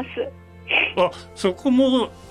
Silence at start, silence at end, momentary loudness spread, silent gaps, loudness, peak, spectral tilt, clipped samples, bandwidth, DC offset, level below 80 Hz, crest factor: 0 s; 0 s; 13 LU; none; -21 LUFS; -8 dBFS; -5 dB/octave; under 0.1%; 11.5 kHz; under 0.1%; -52 dBFS; 14 dB